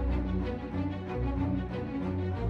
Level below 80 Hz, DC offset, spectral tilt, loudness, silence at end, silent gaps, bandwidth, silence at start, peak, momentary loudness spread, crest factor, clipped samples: -38 dBFS; under 0.1%; -9.5 dB/octave; -33 LUFS; 0 s; none; 6 kHz; 0 s; -18 dBFS; 3 LU; 12 dB; under 0.1%